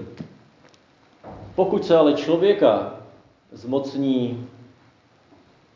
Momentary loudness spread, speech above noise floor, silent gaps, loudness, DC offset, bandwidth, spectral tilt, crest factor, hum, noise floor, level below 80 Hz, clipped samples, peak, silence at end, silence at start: 25 LU; 37 dB; none; -20 LUFS; under 0.1%; 7.4 kHz; -7 dB/octave; 20 dB; none; -56 dBFS; -60 dBFS; under 0.1%; -4 dBFS; 1.25 s; 0 s